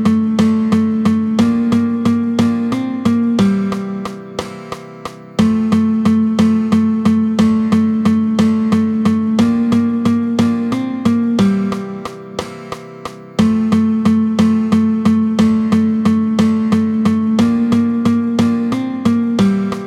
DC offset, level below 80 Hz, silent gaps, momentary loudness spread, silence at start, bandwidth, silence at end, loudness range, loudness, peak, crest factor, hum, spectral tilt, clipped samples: under 0.1%; -48 dBFS; none; 13 LU; 0 s; 10.5 kHz; 0 s; 4 LU; -14 LUFS; 0 dBFS; 14 dB; none; -7 dB/octave; under 0.1%